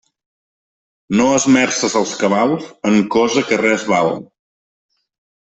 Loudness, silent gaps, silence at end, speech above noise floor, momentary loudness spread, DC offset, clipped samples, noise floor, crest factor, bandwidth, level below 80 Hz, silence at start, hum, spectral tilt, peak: -15 LUFS; none; 1.3 s; over 75 dB; 7 LU; under 0.1%; under 0.1%; under -90 dBFS; 16 dB; 8.4 kHz; -56 dBFS; 1.1 s; none; -4 dB/octave; -2 dBFS